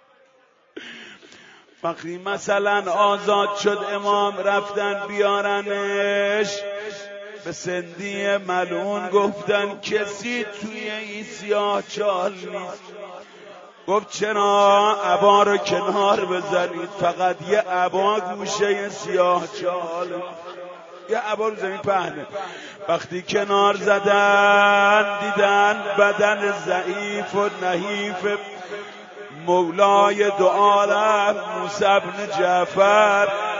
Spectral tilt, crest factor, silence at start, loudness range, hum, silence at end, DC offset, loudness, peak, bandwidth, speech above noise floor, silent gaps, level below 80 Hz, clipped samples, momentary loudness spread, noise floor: -3.5 dB/octave; 18 dB; 0.75 s; 8 LU; none; 0 s; under 0.1%; -20 LUFS; -2 dBFS; 7.8 kHz; 37 dB; none; -70 dBFS; under 0.1%; 17 LU; -58 dBFS